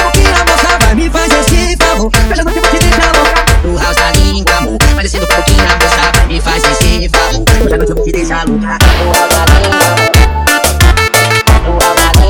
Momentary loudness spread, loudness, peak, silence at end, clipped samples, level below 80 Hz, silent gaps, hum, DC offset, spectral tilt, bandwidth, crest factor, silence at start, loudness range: 4 LU; -8 LUFS; 0 dBFS; 0 s; 0.5%; -12 dBFS; none; none; under 0.1%; -4 dB/octave; 19.5 kHz; 8 dB; 0 s; 2 LU